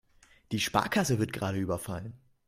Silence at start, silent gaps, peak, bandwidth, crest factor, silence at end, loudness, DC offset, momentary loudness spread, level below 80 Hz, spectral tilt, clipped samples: 0.5 s; none; -8 dBFS; 16 kHz; 24 dB; 0.3 s; -31 LUFS; under 0.1%; 12 LU; -58 dBFS; -4.5 dB/octave; under 0.1%